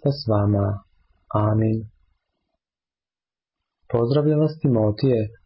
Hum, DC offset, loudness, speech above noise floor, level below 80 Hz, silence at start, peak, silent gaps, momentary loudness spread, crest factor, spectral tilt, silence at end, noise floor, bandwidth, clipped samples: none; under 0.1%; -22 LUFS; over 70 dB; -48 dBFS; 0.05 s; -10 dBFS; none; 7 LU; 14 dB; -13 dB/octave; 0.15 s; under -90 dBFS; 5.8 kHz; under 0.1%